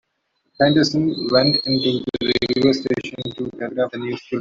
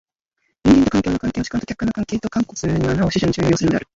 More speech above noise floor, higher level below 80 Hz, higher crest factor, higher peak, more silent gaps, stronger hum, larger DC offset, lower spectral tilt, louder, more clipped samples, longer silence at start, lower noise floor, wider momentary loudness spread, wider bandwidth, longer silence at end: about the same, 51 dB vs 51 dB; second, -54 dBFS vs -38 dBFS; about the same, 18 dB vs 16 dB; about the same, -2 dBFS vs -2 dBFS; neither; neither; neither; about the same, -5.5 dB/octave vs -6 dB/octave; about the same, -19 LUFS vs -19 LUFS; neither; about the same, 0.6 s vs 0.65 s; about the same, -70 dBFS vs -71 dBFS; first, 12 LU vs 9 LU; about the same, 7.6 kHz vs 8 kHz; second, 0 s vs 0.15 s